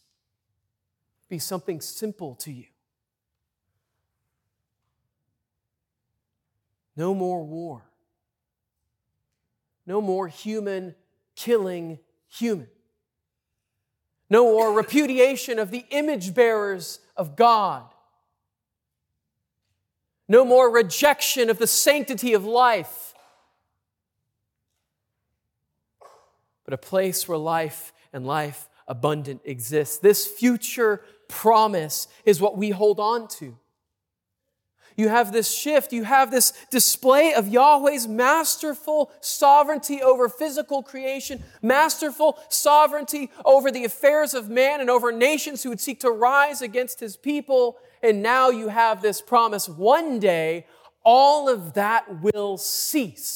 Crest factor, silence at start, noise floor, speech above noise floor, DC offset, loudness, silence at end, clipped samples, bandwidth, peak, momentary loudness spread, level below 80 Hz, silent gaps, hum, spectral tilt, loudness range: 18 dB; 1.3 s; -84 dBFS; 64 dB; under 0.1%; -21 LUFS; 0 s; under 0.1%; 18.5 kHz; -4 dBFS; 16 LU; -70 dBFS; none; none; -3 dB/octave; 15 LU